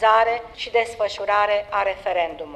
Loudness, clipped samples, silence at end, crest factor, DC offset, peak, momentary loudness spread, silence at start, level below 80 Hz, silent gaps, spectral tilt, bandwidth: -22 LUFS; under 0.1%; 0 s; 16 dB; under 0.1%; -4 dBFS; 6 LU; 0 s; -52 dBFS; none; -2.5 dB/octave; 11.5 kHz